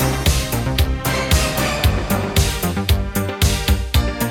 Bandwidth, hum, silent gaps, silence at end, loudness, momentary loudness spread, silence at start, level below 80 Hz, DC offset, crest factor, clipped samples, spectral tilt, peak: 18 kHz; none; none; 0 s; -18 LUFS; 3 LU; 0 s; -22 dBFS; under 0.1%; 14 dB; under 0.1%; -4.5 dB/octave; -4 dBFS